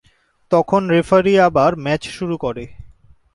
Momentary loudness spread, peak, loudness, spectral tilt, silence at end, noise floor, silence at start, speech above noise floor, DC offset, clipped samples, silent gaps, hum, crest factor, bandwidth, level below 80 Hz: 12 LU; -2 dBFS; -16 LUFS; -6.5 dB/octave; 0.45 s; -46 dBFS; 0.5 s; 30 dB; under 0.1%; under 0.1%; none; none; 16 dB; 11.5 kHz; -46 dBFS